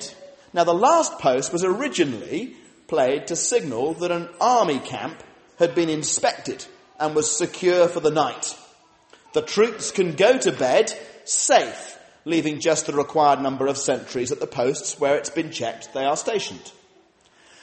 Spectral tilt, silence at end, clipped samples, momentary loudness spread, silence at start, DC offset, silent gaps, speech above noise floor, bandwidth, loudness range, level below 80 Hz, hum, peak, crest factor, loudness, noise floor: -3 dB/octave; 0.9 s; under 0.1%; 13 LU; 0 s; under 0.1%; none; 35 dB; 8.8 kHz; 3 LU; -66 dBFS; none; -4 dBFS; 18 dB; -22 LUFS; -57 dBFS